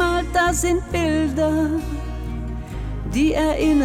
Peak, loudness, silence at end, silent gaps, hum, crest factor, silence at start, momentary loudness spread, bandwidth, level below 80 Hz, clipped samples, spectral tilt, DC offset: -8 dBFS; -21 LUFS; 0 s; none; none; 14 dB; 0 s; 11 LU; 16 kHz; -30 dBFS; under 0.1%; -5 dB/octave; under 0.1%